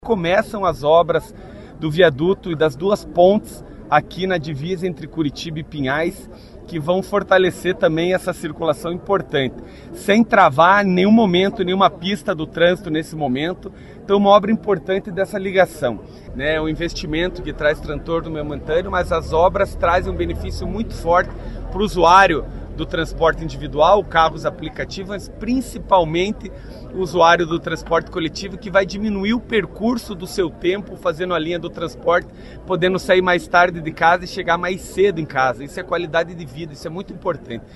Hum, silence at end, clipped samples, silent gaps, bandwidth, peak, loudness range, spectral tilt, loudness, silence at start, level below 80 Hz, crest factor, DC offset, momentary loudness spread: none; 0 s; under 0.1%; none; 12.5 kHz; 0 dBFS; 6 LU; -6 dB/octave; -18 LUFS; 0.05 s; -36 dBFS; 18 dB; under 0.1%; 14 LU